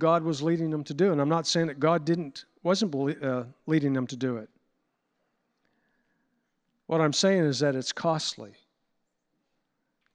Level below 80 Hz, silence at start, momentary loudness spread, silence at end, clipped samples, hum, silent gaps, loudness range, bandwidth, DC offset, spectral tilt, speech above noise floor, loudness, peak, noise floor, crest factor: -80 dBFS; 0 s; 9 LU; 1.65 s; under 0.1%; none; none; 7 LU; 10 kHz; under 0.1%; -5 dB/octave; 51 dB; -27 LUFS; -10 dBFS; -78 dBFS; 20 dB